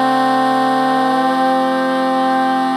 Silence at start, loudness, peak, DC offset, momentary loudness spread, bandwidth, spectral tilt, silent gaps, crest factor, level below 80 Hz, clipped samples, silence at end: 0 s; -15 LUFS; -4 dBFS; under 0.1%; 2 LU; 16 kHz; -5 dB/octave; none; 10 dB; -76 dBFS; under 0.1%; 0 s